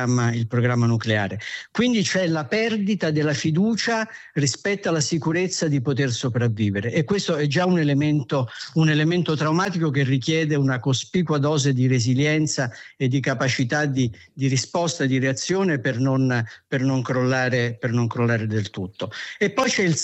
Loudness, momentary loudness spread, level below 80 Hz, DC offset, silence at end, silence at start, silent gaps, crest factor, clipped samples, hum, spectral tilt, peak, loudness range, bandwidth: -22 LUFS; 6 LU; -62 dBFS; under 0.1%; 0 s; 0 s; none; 14 dB; under 0.1%; none; -5.5 dB/octave; -8 dBFS; 2 LU; 8.4 kHz